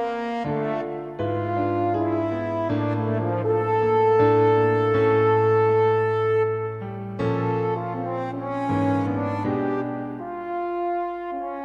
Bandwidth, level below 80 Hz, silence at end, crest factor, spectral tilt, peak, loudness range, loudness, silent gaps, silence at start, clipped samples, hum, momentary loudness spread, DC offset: 6.6 kHz; -56 dBFS; 0 s; 14 dB; -9 dB/octave; -8 dBFS; 6 LU; -23 LUFS; none; 0 s; under 0.1%; none; 11 LU; under 0.1%